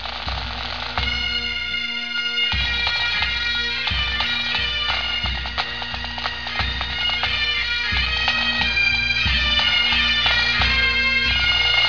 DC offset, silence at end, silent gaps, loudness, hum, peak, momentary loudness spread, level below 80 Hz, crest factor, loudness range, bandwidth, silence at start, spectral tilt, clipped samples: 0.9%; 0 s; none; -19 LUFS; 60 Hz at -50 dBFS; -4 dBFS; 9 LU; -32 dBFS; 16 dB; 5 LU; 5.4 kHz; 0 s; -3 dB/octave; under 0.1%